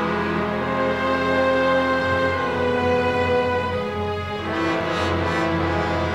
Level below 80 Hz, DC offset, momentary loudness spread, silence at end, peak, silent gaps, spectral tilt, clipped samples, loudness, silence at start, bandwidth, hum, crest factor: -44 dBFS; 0.2%; 6 LU; 0 s; -8 dBFS; none; -6 dB/octave; under 0.1%; -21 LUFS; 0 s; 12 kHz; none; 14 dB